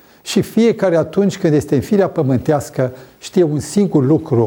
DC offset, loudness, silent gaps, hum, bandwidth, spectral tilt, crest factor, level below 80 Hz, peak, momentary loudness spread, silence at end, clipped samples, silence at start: under 0.1%; -16 LUFS; none; none; 19 kHz; -7 dB/octave; 14 dB; -48 dBFS; -2 dBFS; 6 LU; 0 s; under 0.1%; 0.25 s